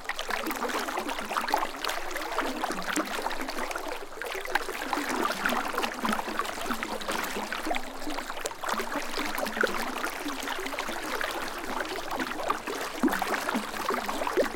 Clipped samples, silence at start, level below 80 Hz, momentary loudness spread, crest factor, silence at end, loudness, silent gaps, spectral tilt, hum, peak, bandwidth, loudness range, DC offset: under 0.1%; 0 s; -46 dBFS; 5 LU; 22 dB; 0 s; -31 LUFS; none; -2.5 dB/octave; none; -10 dBFS; 17 kHz; 2 LU; under 0.1%